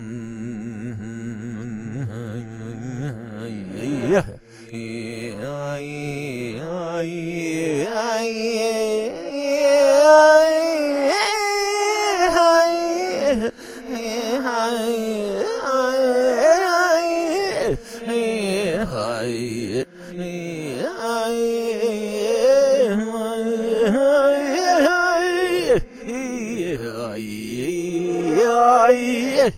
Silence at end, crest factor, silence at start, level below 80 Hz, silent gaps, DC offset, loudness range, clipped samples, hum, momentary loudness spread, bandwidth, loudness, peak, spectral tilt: 0 s; 20 dB; 0 s; -48 dBFS; none; under 0.1%; 11 LU; under 0.1%; none; 16 LU; 16 kHz; -20 LUFS; 0 dBFS; -4.5 dB/octave